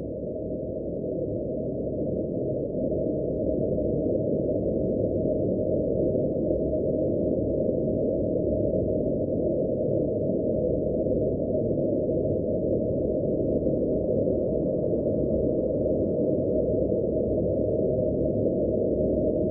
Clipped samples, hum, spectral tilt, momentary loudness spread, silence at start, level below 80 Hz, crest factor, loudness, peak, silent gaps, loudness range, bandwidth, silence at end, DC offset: under 0.1%; none; -16.5 dB/octave; 4 LU; 0 s; -42 dBFS; 14 dB; -26 LUFS; -12 dBFS; none; 2 LU; 1.3 kHz; 0 s; under 0.1%